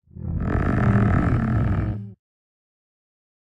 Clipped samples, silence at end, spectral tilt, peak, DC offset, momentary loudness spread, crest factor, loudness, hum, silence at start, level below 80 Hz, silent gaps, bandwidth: under 0.1%; 1.35 s; -10 dB/octave; -6 dBFS; under 0.1%; 12 LU; 16 dB; -22 LUFS; none; 0.15 s; -32 dBFS; none; 7 kHz